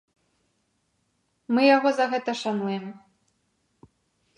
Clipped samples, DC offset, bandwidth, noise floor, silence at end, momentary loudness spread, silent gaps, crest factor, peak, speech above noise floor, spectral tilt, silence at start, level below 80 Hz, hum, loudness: under 0.1%; under 0.1%; 11 kHz; -72 dBFS; 1.4 s; 13 LU; none; 20 dB; -6 dBFS; 50 dB; -5 dB/octave; 1.5 s; -78 dBFS; none; -23 LUFS